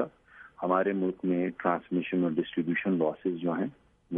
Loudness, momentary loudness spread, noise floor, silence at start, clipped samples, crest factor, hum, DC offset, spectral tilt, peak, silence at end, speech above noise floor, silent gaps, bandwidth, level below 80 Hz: -30 LUFS; 6 LU; -54 dBFS; 0 s; under 0.1%; 20 dB; none; under 0.1%; -10 dB/octave; -10 dBFS; 0 s; 25 dB; none; 3.7 kHz; -70 dBFS